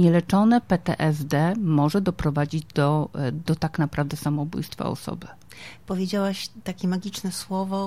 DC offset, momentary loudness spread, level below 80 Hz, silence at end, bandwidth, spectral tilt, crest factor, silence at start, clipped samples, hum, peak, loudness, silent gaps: 0.3%; 13 LU; -50 dBFS; 0 s; 15.5 kHz; -7 dB/octave; 16 dB; 0 s; under 0.1%; none; -8 dBFS; -24 LUFS; none